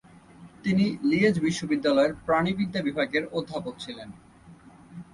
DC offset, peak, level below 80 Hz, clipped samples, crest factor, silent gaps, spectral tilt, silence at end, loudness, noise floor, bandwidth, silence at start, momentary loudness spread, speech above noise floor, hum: under 0.1%; -10 dBFS; -58 dBFS; under 0.1%; 16 dB; none; -6 dB/octave; 0.1 s; -26 LUFS; -51 dBFS; 11.5 kHz; 0.4 s; 16 LU; 26 dB; none